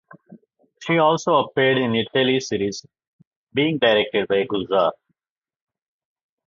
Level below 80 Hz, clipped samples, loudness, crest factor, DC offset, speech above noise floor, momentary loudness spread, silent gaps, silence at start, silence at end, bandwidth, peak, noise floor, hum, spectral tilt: -60 dBFS; under 0.1%; -20 LUFS; 20 dB; under 0.1%; over 70 dB; 8 LU; 3.07-3.19 s, 3.27-3.47 s; 0.3 s; 1.55 s; 7.6 kHz; -2 dBFS; under -90 dBFS; none; -5 dB/octave